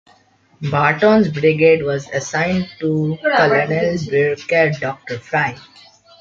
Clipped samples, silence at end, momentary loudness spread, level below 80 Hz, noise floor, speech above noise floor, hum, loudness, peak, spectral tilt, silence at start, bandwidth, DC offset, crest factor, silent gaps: under 0.1%; 0.6 s; 9 LU; -52 dBFS; -54 dBFS; 37 dB; none; -17 LUFS; -2 dBFS; -6 dB/octave; 0.6 s; 7.6 kHz; under 0.1%; 16 dB; none